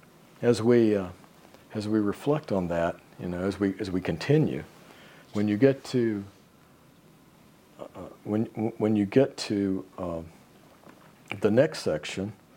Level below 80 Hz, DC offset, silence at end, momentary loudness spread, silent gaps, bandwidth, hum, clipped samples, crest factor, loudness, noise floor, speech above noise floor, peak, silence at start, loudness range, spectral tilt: -64 dBFS; under 0.1%; 0.25 s; 16 LU; none; 16.5 kHz; none; under 0.1%; 22 dB; -27 LUFS; -57 dBFS; 30 dB; -6 dBFS; 0.4 s; 3 LU; -7 dB/octave